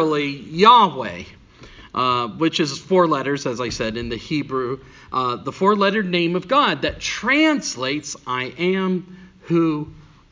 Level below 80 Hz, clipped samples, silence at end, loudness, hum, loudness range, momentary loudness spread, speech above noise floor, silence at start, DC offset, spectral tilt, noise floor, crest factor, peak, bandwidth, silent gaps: -48 dBFS; under 0.1%; 0.3 s; -20 LUFS; none; 4 LU; 12 LU; 24 dB; 0 s; under 0.1%; -4.5 dB/octave; -44 dBFS; 20 dB; 0 dBFS; 7.6 kHz; none